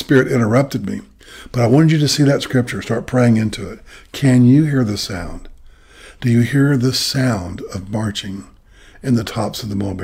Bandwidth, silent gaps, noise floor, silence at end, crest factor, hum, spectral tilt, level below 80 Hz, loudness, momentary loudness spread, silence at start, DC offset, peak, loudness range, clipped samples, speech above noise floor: 16 kHz; none; -44 dBFS; 0 s; 14 dB; none; -6 dB/octave; -42 dBFS; -16 LUFS; 16 LU; 0 s; under 0.1%; -2 dBFS; 4 LU; under 0.1%; 28 dB